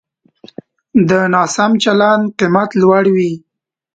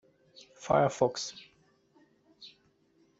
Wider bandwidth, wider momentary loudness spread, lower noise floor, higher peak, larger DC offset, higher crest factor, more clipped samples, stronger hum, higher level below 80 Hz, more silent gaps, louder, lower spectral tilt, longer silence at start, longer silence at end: first, 9.2 kHz vs 8 kHz; second, 5 LU vs 25 LU; second, -44 dBFS vs -68 dBFS; first, 0 dBFS vs -12 dBFS; neither; second, 14 dB vs 24 dB; neither; neither; first, -54 dBFS vs -66 dBFS; neither; first, -12 LUFS vs -30 LUFS; about the same, -5.5 dB/octave vs -5 dB/octave; first, 0.95 s vs 0.6 s; about the same, 0.6 s vs 0.7 s